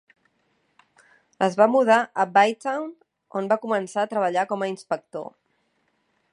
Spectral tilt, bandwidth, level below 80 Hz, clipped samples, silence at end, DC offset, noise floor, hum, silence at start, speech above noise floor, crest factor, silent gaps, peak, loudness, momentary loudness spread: -5 dB/octave; 11 kHz; -80 dBFS; under 0.1%; 1.05 s; under 0.1%; -70 dBFS; none; 1.4 s; 48 dB; 20 dB; none; -4 dBFS; -23 LUFS; 15 LU